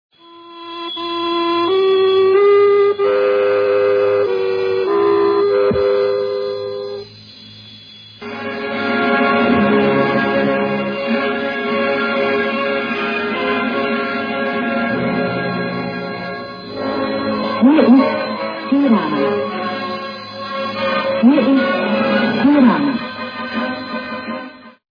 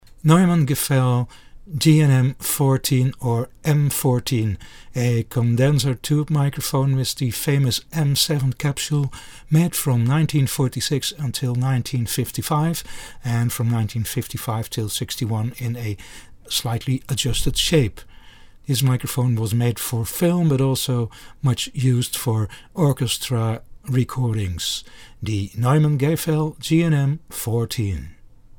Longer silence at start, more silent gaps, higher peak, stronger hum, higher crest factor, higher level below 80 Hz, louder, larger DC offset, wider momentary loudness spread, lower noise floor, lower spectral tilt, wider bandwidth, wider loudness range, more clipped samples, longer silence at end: about the same, 0.3 s vs 0.25 s; neither; about the same, 0 dBFS vs -2 dBFS; neither; about the same, 16 dB vs 18 dB; second, -54 dBFS vs -42 dBFS; first, -16 LUFS vs -21 LUFS; neither; first, 14 LU vs 9 LU; second, -39 dBFS vs -44 dBFS; first, -7.5 dB/octave vs -5.5 dB/octave; second, 5.2 kHz vs 20 kHz; about the same, 6 LU vs 4 LU; neither; second, 0.2 s vs 0.45 s